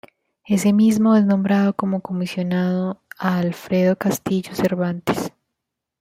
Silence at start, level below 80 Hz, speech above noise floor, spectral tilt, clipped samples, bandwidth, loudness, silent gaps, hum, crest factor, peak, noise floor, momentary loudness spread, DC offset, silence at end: 0.5 s; -60 dBFS; 62 dB; -6.5 dB/octave; under 0.1%; 16 kHz; -20 LUFS; none; none; 16 dB; -4 dBFS; -81 dBFS; 9 LU; under 0.1%; 0.7 s